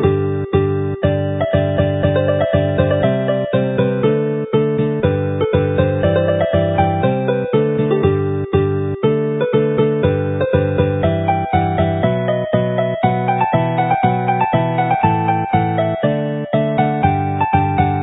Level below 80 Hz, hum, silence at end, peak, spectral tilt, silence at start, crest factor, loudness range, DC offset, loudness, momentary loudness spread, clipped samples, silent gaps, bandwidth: -34 dBFS; none; 0 s; 0 dBFS; -13 dB/octave; 0 s; 16 dB; 1 LU; under 0.1%; -16 LUFS; 3 LU; under 0.1%; none; 4 kHz